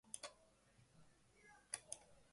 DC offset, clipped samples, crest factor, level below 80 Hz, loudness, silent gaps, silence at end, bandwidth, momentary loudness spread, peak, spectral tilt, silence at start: under 0.1%; under 0.1%; 34 dB; -82 dBFS; -53 LUFS; none; 0 s; 11.5 kHz; 17 LU; -26 dBFS; -0.5 dB/octave; 0.05 s